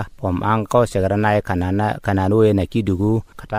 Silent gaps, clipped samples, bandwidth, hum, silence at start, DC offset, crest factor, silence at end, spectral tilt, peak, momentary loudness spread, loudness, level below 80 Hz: none; under 0.1%; 15 kHz; none; 0 s; under 0.1%; 16 dB; 0 s; -7.5 dB/octave; -2 dBFS; 6 LU; -19 LUFS; -40 dBFS